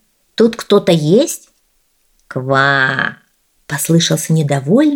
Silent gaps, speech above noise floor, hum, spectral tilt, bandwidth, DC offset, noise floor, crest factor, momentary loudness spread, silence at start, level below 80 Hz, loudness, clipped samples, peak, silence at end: none; 47 dB; none; -5 dB/octave; 19 kHz; under 0.1%; -60 dBFS; 14 dB; 13 LU; 0.4 s; -58 dBFS; -14 LUFS; under 0.1%; 0 dBFS; 0 s